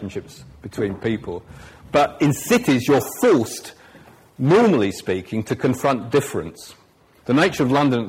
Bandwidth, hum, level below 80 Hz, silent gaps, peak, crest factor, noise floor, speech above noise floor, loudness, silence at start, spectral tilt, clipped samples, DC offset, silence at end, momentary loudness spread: 16 kHz; none; -52 dBFS; none; -4 dBFS; 16 dB; -48 dBFS; 28 dB; -20 LUFS; 0 s; -5.5 dB/octave; under 0.1%; under 0.1%; 0 s; 17 LU